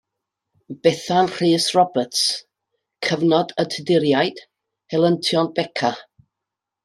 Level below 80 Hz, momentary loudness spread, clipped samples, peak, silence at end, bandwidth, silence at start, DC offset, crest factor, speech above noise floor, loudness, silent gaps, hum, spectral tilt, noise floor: -66 dBFS; 7 LU; under 0.1%; -2 dBFS; 0.8 s; 13.5 kHz; 0.7 s; under 0.1%; 18 dB; 65 dB; -20 LUFS; none; none; -4.5 dB/octave; -84 dBFS